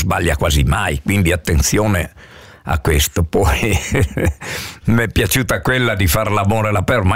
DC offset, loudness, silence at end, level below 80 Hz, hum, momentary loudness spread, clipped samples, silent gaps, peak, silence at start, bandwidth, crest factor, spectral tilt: 0.5%; -16 LUFS; 0 s; -24 dBFS; none; 5 LU; under 0.1%; none; -4 dBFS; 0 s; 16.5 kHz; 12 dB; -5 dB/octave